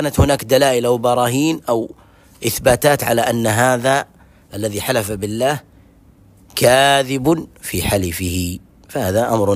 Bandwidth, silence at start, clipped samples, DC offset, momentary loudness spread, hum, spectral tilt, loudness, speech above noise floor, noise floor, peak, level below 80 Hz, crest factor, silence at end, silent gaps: 16 kHz; 0 s; under 0.1%; under 0.1%; 12 LU; none; -4.5 dB/octave; -17 LUFS; 32 dB; -48 dBFS; 0 dBFS; -38 dBFS; 16 dB; 0 s; none